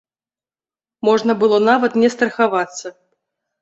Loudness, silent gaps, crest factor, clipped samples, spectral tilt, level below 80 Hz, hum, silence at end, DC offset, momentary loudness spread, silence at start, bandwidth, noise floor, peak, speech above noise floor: -16 LUFS; none; 16 dB; under 0.1%; -4.5 dB/octave; -64 dBFS; none; 0.7 s; under 0.1%; 12 LU; 1.05 s; 8 kHz; under -90 dBFS; -2 dBFS; over 74 dB